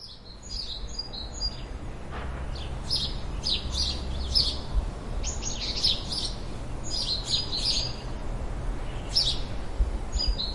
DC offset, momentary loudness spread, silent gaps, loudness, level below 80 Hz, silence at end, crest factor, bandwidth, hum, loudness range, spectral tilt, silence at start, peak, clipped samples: under 0.1%; 13 LU; none; -29 LUFS; -34 dBFS; 0 s; 20 dB; 11.5 kHz; none; 4 LU; -3 dB/octave; 0 s; -8 dBFS; under 0.1%